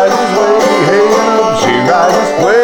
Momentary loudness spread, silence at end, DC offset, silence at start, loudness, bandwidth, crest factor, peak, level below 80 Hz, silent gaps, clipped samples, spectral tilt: 2 LU; 0 s; under 0.1%; 0 s; -9 LUFS; 19 kHz; 8 dB; 0 dBFS; -46 dBFS; none; under 0.1%; -4.5 dB/octave